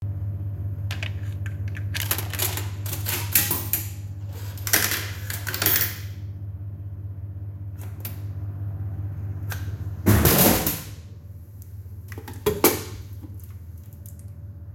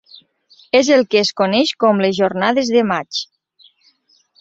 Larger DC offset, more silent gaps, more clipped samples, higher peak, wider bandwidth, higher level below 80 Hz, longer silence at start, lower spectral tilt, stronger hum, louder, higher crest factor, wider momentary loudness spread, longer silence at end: neither; neither; neither; about the same, 0 dBFS vs -2 dBFS; first, 17 kHz vs 8 kHz; first, -44 dBFS vs -60 dBFS; second, 0 s vs 0.75 s; about the same, -4 dB/octave vs -4.5 dB/octave; neither; second, -25 LUFS vs -16 LUFS; first, 26 dB vs 16 dB; first, 21 LU vs 9 LU; second, 0 s vs 1.15 s